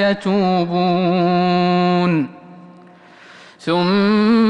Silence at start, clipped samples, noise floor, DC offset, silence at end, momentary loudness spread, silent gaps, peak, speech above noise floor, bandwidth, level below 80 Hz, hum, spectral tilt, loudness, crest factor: 0 s; under 0.1%; -44 dBFS; under 0.1%; 0 s; 6 LU; none; -6 dBFS; 29 dB; 9 kHz; -58 dBFS; none; -8 dB/octave; -16 LUFS; 10 dB